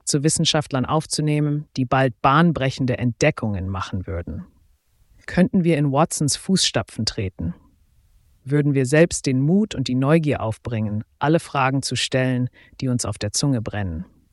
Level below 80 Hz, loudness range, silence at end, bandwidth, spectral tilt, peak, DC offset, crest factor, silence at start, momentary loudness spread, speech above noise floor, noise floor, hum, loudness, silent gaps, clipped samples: -46 dBFS; 3 LU; 0.3 s; 12 kHz; -5 dB/octave; -4 dBFS; under 0.1%; 18 dB; 0.05 s; 11 LU; 38 dB; -59 dBFS; none; -21 LUFS; none; under 0.1%